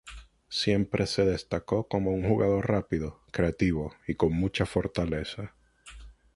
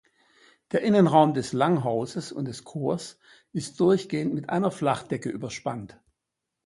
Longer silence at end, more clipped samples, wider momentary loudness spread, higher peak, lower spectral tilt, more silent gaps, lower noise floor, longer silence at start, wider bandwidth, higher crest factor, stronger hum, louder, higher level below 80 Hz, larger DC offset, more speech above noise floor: second, 0.25 s vs 0.8 s; neither; second, 11 LU vs 14 LU; second, -10 dBFS vs -4 dBFS; about the same, -6.5 dB/octave vs -6.5 dB/octave; neither; second, -49 dBFS vs -85 dBFS; second, 0.05 s vs 0.75 s; about the same, 11.5 kHz vs 11.5 kHz; about the same, 18 dB vs 22 dB; neither; second, -29 LUFS vs -26 LUFS; first, -44 dBFS vs -64 dBFS; neither; second, 21 dB vs 59 dB